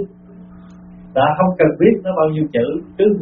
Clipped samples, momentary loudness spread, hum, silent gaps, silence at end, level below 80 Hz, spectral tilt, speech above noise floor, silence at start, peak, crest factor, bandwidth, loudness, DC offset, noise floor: under 0.1%; 9 LU; 60 Hz at -35 dBFS; none; 0 s; -50 dBFS; -6.5 dB/octave; 25 dB; 0 s; 0 dBFS; 16 dB; 4 kHz; -16 LUFS; under 0.1%; -40 dBFS